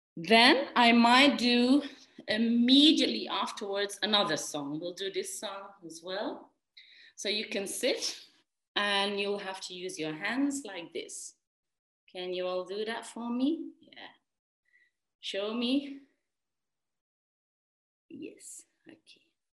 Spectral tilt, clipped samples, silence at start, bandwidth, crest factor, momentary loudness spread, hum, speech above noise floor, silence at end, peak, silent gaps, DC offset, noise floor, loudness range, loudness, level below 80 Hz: -2.5 dB/octave; under 0.1%; 0.15 s; 12.5 kHz; 24 dB; 24 LU; none; over 61 dB; 0.9 s; -8 dBFS; 8.68-8.75 s, 11.47-11.63 s, 11.79-12.07 s, 14.39-14.63 s, 15.15-15.19 s, 17.01-18.09 s; under 0.1%; under -90 dBFS; 14 LU; -28 LUFS; -80 dBFS